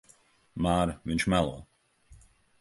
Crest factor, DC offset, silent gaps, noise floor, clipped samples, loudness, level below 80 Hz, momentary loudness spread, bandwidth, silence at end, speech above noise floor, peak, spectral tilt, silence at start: 22 dB; under 0.1%; none; -62 dBFS; under 0.1%; -29 LUFS; -46 dBFS; 15 LU; 11.5 kHz; 0.45 s; 35 dB; -10 dBFS; -5.5 dB/octave; 0.55 s